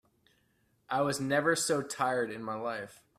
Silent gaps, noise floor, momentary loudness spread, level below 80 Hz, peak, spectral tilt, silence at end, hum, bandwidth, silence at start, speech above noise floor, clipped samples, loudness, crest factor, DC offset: none; -72 dBFS; 9 LU; -72 dBFS; -14 dBFS; -3.5 dB/octave; 0.25 s; none; 15.5 kHz; 0.9 s; 41 dB; under 0.1%; -31 LUFS; 20 dB; under 0.1%